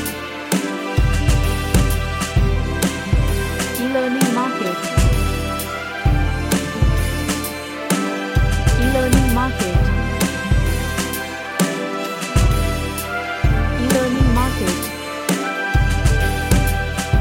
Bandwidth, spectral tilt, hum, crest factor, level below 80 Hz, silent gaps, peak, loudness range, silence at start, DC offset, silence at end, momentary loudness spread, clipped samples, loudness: 17 kHz; -5 dB/octave; none; 18 dB; -22 dBFS; none; 0 dBFS; 2 LU; 0 s; under 0.1%; 0 s; 6 LU; under 0.1%; -19 LUFS